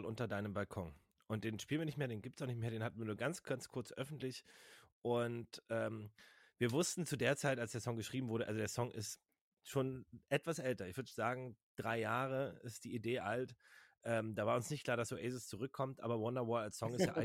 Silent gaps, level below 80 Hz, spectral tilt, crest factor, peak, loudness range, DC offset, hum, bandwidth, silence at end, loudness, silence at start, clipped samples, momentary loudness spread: 4.92-5.02 s, 9.41-9.52 s, 11.63-11.75 s; -74 dBFS; -5 dB/octave; 20 dB; -22 dBFS; 4 LU; under 0.1%; none; 16.5 kHz; 0 s; -42 LUFS; 0 s; under 0.1%; 10 LU